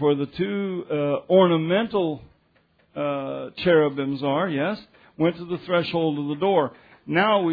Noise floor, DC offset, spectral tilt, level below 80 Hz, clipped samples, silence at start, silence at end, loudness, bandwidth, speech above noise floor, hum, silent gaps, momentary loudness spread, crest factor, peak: -63 dBFS; under 0.1%; -9.5 dB/octave; -62 dBFS; under 0.1%; 0 s; 0 s; -23 LUFS; 5 kHz; 40 dB; none; none; 10 LU; 18 dB; -4 dBFS